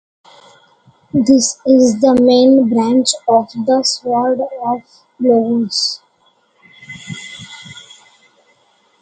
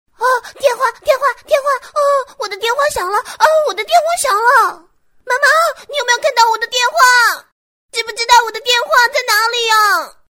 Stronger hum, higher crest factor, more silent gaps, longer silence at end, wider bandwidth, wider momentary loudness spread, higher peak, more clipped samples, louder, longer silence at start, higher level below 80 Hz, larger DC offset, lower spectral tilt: neither; about the same, 14 dB vs 14 dB; second, none vs 7.52-7.89 s; first, 1.2 s vs 0.2 s; second, 9.4 kHz vs 17.5 kHz; first, 21 LU vs 8 LU; about the same, 0 dBFS vs 0 dBFS; neither; about the same, -13 LUFS vs -13 LUFS; first, 1.15 s vs 0.2 s; about the same, -58 dBFS vs -54 dBFS; neither; first, -4 dB/octave vs 1 dB/octave